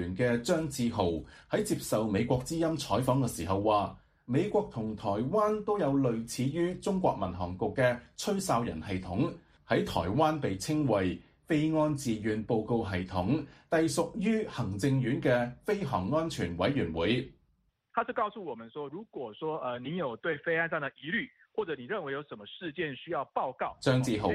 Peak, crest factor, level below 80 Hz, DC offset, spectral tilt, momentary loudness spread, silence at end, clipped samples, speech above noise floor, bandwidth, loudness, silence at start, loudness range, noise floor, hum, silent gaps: -12 dBFS; 18 dB; -56 dBFS; under 0.1%; -6 dB/octave; 8 LU; 0 s; under 0.1%; 43 dB; 15 kHz; -31 LUFS; 0 s; 4 LU; -73 dBFS; none; none